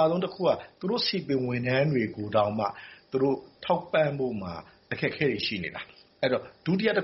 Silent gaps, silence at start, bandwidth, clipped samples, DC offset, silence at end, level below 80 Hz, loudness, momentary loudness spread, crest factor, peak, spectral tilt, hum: none; 0 s; 6 kHz; under 0.1%; under 0.1%; 0 s; -62 dBFS; -28 LUFS; 11 LU; 18 dB; -10 dBFS; -4 dB/octave; none